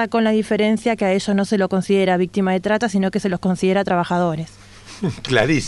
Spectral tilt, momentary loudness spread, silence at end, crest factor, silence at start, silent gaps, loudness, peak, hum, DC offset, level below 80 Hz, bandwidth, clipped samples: -6 dB/octave; 8 LU; 0 s; 16 dB; 0 s; none; -19 LUFS; -2 dBFS; none; under 0.1%; -48 dBFS; 11.5 kHz; under 0.1%